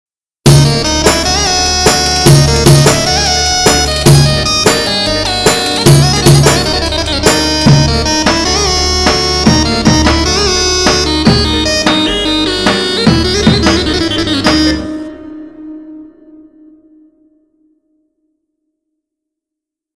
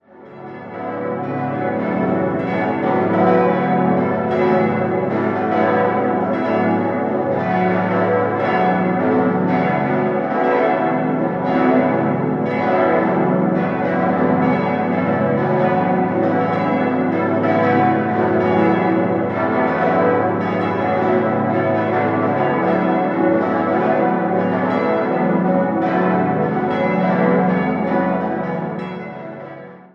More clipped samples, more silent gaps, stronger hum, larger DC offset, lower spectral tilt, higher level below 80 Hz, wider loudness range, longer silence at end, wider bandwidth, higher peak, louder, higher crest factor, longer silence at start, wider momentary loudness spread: first, 0.5% vs under 0.1%; neither; neither; neither; second, -4 dB/octave vs -9.5 dB/octave; first, -22 dBFS vs -52 dBFS; first, 5 LU vs 1 LU; first, 3.9 s vs 0.2 s; first, 11 kHz vs 6 kHz; about the same, 0 dBFS vs -2 dBFS; first, -9 LUFS vs -17 LUFS; second, 10 dB vs 16 dB; first, 0.45 s vs 0.15 s; about the same, 6 LU vs 5 LU